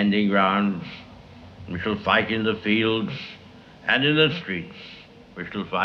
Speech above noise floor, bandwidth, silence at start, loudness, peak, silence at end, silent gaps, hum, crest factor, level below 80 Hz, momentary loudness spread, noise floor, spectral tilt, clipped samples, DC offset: 22 dB; 6.4 kHz; 0 s; -23 LUFS; -4 dBFS; 0 s; none; none; 20 dB; -56 dBFS; 21 LU; -45 dBFS; -7 dB/octave; under 0.1%; under 0.1%